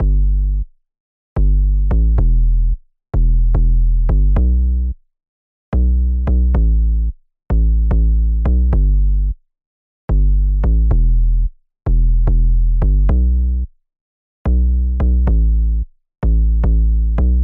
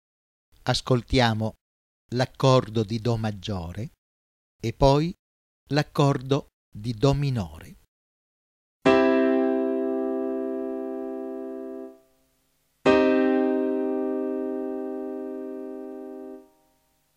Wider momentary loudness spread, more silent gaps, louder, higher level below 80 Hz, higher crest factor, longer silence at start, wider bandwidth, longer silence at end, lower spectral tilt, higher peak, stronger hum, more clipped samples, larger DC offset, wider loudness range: second, 9 LU vs 16 LU; second, 1.00-1.36 s, 5.28-5.72 s, 9.66-10.08 s, 14.01-14.45 s vs 1.61-2.09 s, 3.98-4.59 s, 5.19-5.66 s, 6.53-6.72 s, 7.88-8.80 s; first, -17 LUFS vs -25 LUFS; first, -14 dBFS vs -46 dBFS; second, 10 dB vs 22 dB; second, 0 s vs 0.65 s; second, 2.2 kHz vs 14 kHz; second, 0 s vs 0.75 s; first, -12 dB/octave vs -6.5 dB/octave; about the same, -4 dBFS vs -4 dBFS; neither; neither; neither; about the same, 2 LU vs 4 LU